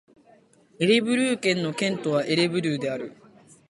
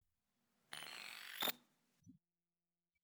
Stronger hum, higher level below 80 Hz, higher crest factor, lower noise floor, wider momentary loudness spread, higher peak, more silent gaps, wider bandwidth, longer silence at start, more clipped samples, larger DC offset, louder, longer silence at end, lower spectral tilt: neither; first, -68 dBFS vs under -90 dBFS; second, 18 dB vs 28 dB; second, -57 dBFS vs under -90 dBFS; second, 9 LU vs 13 LU; first, -8 dBFS vs -24 dBFS; neither; second, 11.5 kHz vs over 20 kHz; about the same, 0.8 s vs 0.7 s; neither; neither; first, -24 LUFS vs -45 LUFS; second, 0.6 s vs 0.85 s; first, -5 dB/octave vs -0.5 dB/octave